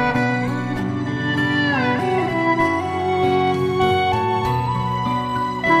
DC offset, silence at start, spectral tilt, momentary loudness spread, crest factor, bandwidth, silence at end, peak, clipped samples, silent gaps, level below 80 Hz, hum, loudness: under 0.1%; 0 s; -6.5 dB/octave; 5 LU; 14 dB; 14.5 kHz; 0 s; -6 dBFS; under 0.1%; none; -44 dBFS; none; -20 LUFS